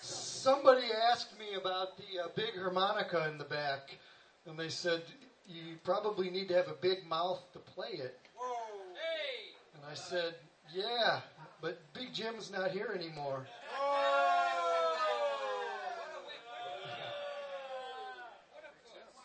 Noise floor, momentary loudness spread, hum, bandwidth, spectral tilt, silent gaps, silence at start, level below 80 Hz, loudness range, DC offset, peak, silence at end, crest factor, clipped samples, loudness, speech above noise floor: -57 dBFS; 18 LU; none; 8.8 kHz; -3.5 dB/octave; none; 0 s; -86 dBFS; 7 LU; under 0.1%; -12 dBFS; 0 s; 26 dB; under 0.1%; -36 LUFS; 22 dB